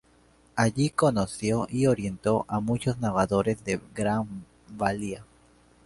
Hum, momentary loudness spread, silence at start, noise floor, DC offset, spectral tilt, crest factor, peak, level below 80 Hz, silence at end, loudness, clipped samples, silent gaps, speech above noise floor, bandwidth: none; 12 LU; 0.55 s; -60 dBFS; under 0.1%; -6 dB/octave; 20 dB; -8 dBFS; -52 dBFS; 0.6 s; -27 LUFS; under 0.1%; none; 34 dB; 11.5 kHz